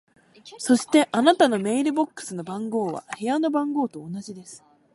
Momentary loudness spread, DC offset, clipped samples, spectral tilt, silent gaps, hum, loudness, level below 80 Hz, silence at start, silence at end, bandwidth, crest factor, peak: 17 LU; under 0.1%; under 0.1%; -4.5 dB/octave; none; none; -23 LUFS; -72 dBFS; 0.45 s; 0.4 s; 11.5 kHz; 20 dB; -4 dBFS